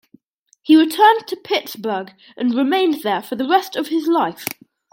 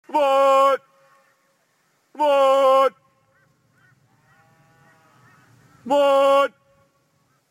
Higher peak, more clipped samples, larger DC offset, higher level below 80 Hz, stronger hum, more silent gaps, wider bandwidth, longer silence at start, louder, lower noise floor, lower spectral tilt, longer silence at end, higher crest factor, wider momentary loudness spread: first, -2 dBFS vs -6 dBFS; neither; neither; about the same, -74 dBFS vs -72 dBFS; neither; neither; about the same, 17 kHz vs 15.5 kHz; first, 0.65 s vs 0.1 s; about the same, -18 LUFS vs -18 LUFS; second, -60 dBFS vs -66 dBFS; about the same, -4 dB/octave vs -3 dB/octave; second, 0.45 s vs 1.05 s; about the same, 16 dB vs 16 dB; first, 15 LU vs 9 LU